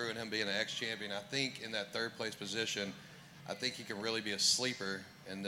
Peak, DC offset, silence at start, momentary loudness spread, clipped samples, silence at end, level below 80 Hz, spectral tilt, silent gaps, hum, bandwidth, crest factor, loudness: -18 dBFS; under 0.1%; 0 s; 14 LU; under 0.1%; 0 s; -80 dBFS; -2 dB/octave; none; none; 16.5 kHz; 20 dB; -37 LUFS